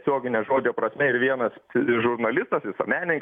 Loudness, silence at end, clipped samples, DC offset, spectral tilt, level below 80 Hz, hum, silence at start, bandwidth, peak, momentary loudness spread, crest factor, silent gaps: -24 LUFS; 0 s; under 0.1%; under 0.1%; -8.5 dB/octave; -68 dBFS; none; 0.05 s; 3.8 kHz; -8 dBFS; 4 LU; 16 dB; none